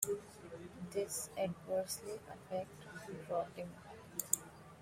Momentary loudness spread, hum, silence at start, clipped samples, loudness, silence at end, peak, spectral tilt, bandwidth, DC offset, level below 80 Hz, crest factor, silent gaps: 14 LU; none; 0 s; under 0.1%; -42 LUFS; 0 s; -10 dBFS; -3.5 dB/octave; 16 kHz; under 0.1%; -72 dBFS; 32 dB; none